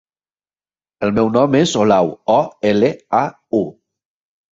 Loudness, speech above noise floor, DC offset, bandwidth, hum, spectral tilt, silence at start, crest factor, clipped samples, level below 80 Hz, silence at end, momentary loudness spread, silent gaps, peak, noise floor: -16 LUFS; over 75 dB; under 0.1%; 8 kHz; none; -6 dB/octave; 1 s; 16 dB; under 0.1%; -54 dBFS; 0.8 s; 7 LU; none; -2 dBFS; under -90 dBFS